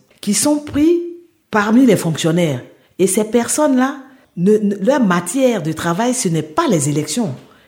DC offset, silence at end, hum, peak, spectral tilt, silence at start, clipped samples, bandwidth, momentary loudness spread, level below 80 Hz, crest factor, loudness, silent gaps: under 0.1%; 0.3 s; none; 0 dBFS; -5 dB/octave; 0.25 s; under 0.1%; 17 kHz; 7 LU; -52 dBFS; 16 dB; -16 LUFS; none